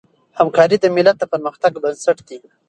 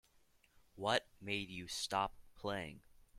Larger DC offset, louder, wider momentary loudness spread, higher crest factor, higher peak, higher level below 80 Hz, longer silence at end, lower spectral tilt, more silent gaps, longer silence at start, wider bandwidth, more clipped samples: neither; first, -16 LUFS vs -41 LUFS; about the same, 8 LU vs 8 LU; second, 16 dB vs 24 dB; first, 0 dBFS vs -20 dBFS; about the same, -62 dBFS vs -66 dBFS; first, 0.3 s vs 0 s; first, -5 dB/octave vs -3 dB/octave; neither; second, 0.35 s vs 0.75 s; second, 11 kHz vs 16.5 kHz; neither